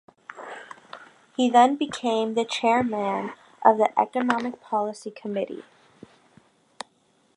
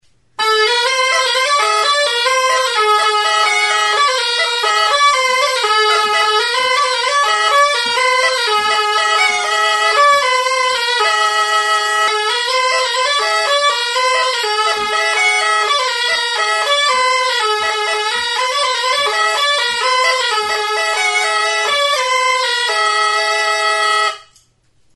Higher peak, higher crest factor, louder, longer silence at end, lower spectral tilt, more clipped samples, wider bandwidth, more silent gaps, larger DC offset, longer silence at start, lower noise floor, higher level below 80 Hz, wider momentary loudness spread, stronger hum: about the same, -2 dBFS vs 0 dBFS; first, 22 dB vs 14 dB; second, -24 LUFS vs -13 LUFS; first, 1.75 s vs 0.75 s; first, -4.5 dB/octave vs 2.5 dB/octave; neither; about the same, 11 kHz vs 12 kHz; neither; neither; about the same, 0.3 s vs 0.4 s; first, -64 dBFS vs -56 dBFS; second, -70 dBFS vs -60 dBFS; first, 22 LU vs 3 LU; neither